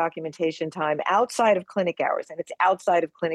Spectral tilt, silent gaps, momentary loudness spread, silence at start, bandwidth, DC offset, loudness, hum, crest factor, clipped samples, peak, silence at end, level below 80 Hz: -4.5 dB/octave; none; 7 LU; 0 s; 12.5 kHz; under 0.1%; -24 LUFS; none; 16 dB; under 0.1%; -8 dBFS; 0 s; -74 dBFS